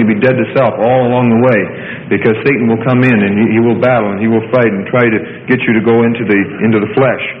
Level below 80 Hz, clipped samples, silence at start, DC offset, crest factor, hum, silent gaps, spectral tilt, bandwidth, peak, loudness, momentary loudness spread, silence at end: -50 dBFS; under 0.1%; 0 s; under 0.1%; 10 dB; none; none; -10 dB/octave; 4.9 kHz; 0 dBFS; -11 LUFS; 4 LU; 0 s